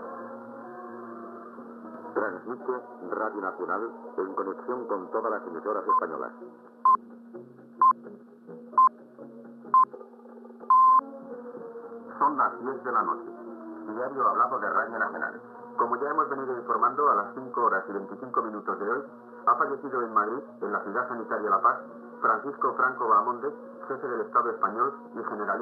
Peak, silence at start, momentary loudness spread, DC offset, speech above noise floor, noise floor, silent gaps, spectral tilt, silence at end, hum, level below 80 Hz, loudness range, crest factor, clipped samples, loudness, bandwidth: -12 dBFS; 0 s; 20 LU; under 0.1%; 19 dB; -47 dBFS; none; -8.5 dB/octave; 0 s; none; under -90 dBFS; 7 LU; 18 dB; under 0.1%; -27 LUFS; 4.7 kHz